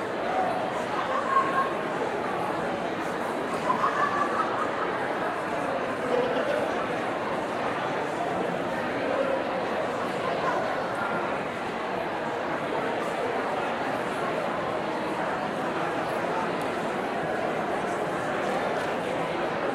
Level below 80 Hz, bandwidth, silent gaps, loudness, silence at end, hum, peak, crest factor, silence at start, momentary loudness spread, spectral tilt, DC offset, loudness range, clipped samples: -62 dBFS; 16 kHz; none; -28 LUFS; 0 s; none; -12 dBFS; 16 dB; 0 s; 4 LU; -5 dB/octave; under 0.1%; 2 LU; under 0.1%